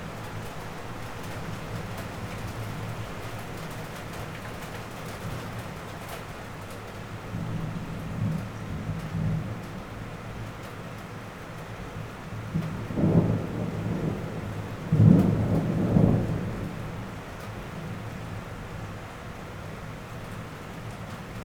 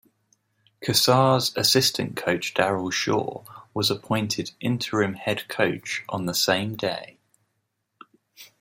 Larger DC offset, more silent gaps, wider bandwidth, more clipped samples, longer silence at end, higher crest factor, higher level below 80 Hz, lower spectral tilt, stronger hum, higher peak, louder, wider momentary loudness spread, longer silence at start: neither; neither; first, 18.5 kHz vs 16.5 kHz; neither; second, 0 s vs 0.15 s; about the same, 26 dB vs 22 dB; first, -46 dBFS vs -64 dBFS; first, -7.5 dB/octave vs -3.5 dB/octave; neither; about the same, -4 dBFS vs -4 dBFS; second, -31 LUFS vs -23 LUFS; first, 15 LU vs 11 LU; second, 0 s vs 0.8 s